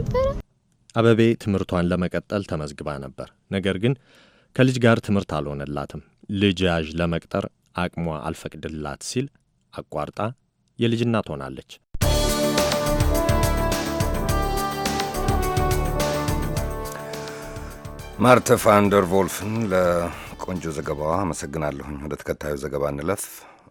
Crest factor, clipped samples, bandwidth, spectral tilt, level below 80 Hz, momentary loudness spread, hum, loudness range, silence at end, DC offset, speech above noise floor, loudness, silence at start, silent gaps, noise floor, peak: 22 dB; under 0.1%; 17.5 kHz; -5.5 dB/octave; -34 dBFS; 15 LU; none; 8 LU; 0.2 s; under 0.1%; 36 dB; -23 LUFS; 0 s; none; -58 dBFS; 0 dBFS